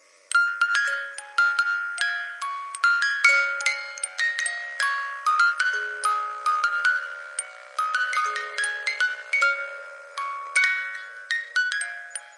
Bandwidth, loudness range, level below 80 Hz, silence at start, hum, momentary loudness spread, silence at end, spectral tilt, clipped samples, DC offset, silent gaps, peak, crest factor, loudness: 11.5 kHz; 3 LU; under -90 dBFS; 0.3 s; none; 11 LU; 0 s; 6.5 dB/octave; under 0.1%; under 0.1%; none; -4 dBFS; 20 dB; -24 LUFS